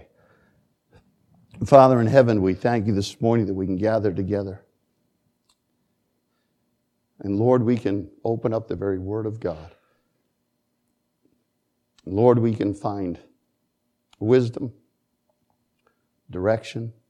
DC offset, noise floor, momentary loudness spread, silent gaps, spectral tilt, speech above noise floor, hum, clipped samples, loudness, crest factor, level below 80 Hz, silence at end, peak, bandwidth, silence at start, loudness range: under 0.1%; -74 dBFS; 17 LU; none; -8 dB/octave; 53 dB; none; under 0.1%; -22 LUFS; 24 dB; -58 dBFS; 0.2 s; 0 dBFS; 10.5 kHz; 1.55 s; 11 LU